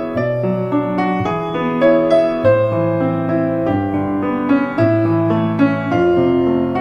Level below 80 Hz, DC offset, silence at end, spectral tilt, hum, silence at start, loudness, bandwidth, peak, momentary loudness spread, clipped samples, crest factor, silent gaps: -46 dBFS; under 0.1%; 0 s; -9 dB/octave; none; 0 s; -16 LUFS; 8.6 kHz; -2 dBFS; 5 LU; under 0.1%; 14 dB; none